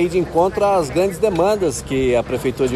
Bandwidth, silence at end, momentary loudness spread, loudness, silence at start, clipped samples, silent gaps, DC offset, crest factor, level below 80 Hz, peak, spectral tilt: 14 kHz; 0 s; 4 LU; -18 LUFS; 0 s; under 0.1%; none; under 0.1%; 14 dB; -38 dBFS; -4 dBFS; -5.5 dB/octave